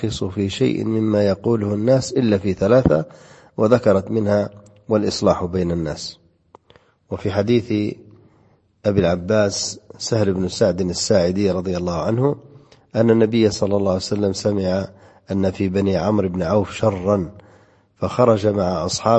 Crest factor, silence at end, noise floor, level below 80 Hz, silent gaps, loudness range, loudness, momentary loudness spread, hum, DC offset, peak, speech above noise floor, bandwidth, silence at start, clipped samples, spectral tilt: 18 dB; 0 s; -57 dBFS; -46 dBFS; none; 4 LU; -19 LUFS; 11 LU; none; under 0.1%; 0 dBFS; 38 dB; 8.6 kHz; 0 s; under 0.1%; -6 dB/octave